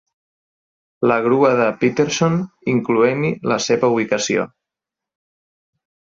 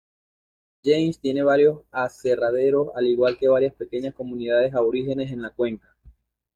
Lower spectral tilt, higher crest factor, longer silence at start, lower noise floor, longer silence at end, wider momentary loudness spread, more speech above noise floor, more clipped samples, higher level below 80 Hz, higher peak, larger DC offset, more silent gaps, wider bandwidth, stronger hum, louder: second, -5 dB/octave vs -7 dB/octave; about the same, 16 dB vs 16 dB; first, 1 s vs 0.85 s; first, -86 dBFS vs -54 dBFS; first, 1.65 s vs 0.8 s; second, 6 LU vs 11 LU; first, 69 dB vs 32 dB; neither; about the same, -60 dBFS vs -58 dBFS; first, -2 dBFS vs -6 dBFS; neither; neither; second, 7.8 kHz vs 9.4 kHz; neither; first, -18 LUFS vs -22 LUFS